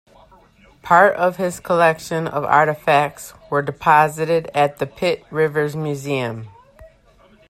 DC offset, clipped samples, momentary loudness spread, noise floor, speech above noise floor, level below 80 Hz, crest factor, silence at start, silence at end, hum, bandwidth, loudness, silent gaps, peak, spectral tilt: under 0.1%; under 0.1%; 10 LU; -52 dBFS; 34 dB; -54 dBFS; 18 dB; 0.85 s; 0.65 s; none; 15.5 kHz; -18 LUFS; none; 0 dBFS; -5.5 dB/octave